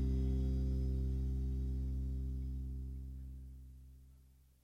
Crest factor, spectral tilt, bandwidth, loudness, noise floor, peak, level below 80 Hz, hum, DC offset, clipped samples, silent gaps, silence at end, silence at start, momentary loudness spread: 10 dB; -9.5 dB/octave; 5.4 kHz; -40 LUFS; -64 dBFS; -28 dBFS; -40 dBFS; none; under 0.1%; under 0.1%; none; 0.45 s; 0 s; 18 LU